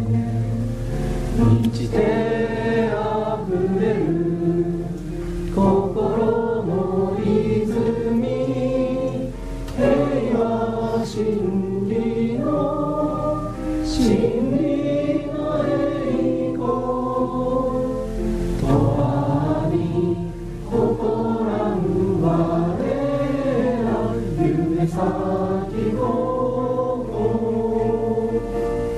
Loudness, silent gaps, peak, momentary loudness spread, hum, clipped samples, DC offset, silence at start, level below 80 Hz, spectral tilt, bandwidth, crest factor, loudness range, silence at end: -21 LUFS; none; -6 dBFS; 5 LU; none; under 0.1%; under 0.1%; 0 s; -34 dBFS; -8 dB/octave; 13 kHz; 16 dB; 1 LU; 0 s